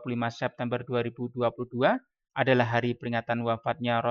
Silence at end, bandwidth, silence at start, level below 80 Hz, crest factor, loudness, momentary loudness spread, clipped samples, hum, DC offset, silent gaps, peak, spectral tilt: 0 s; 7 kHz; 0 s; -68 dBFS; 18 dB; -29 LUFS; 8 LU; under 0.1%; none; under 0.1%; none; -10 dBFS; -7.5 dB/octave